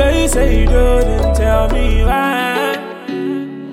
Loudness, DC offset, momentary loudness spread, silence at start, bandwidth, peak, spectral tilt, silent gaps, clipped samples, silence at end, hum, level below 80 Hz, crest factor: -15 LUFS; under 0.1%; 9 LU; 0 s; 15 kHz; -2 dBFS; -5.5 dB/octave; none; under 0.1%; 0 s; none; -16 dBFS; 12 dB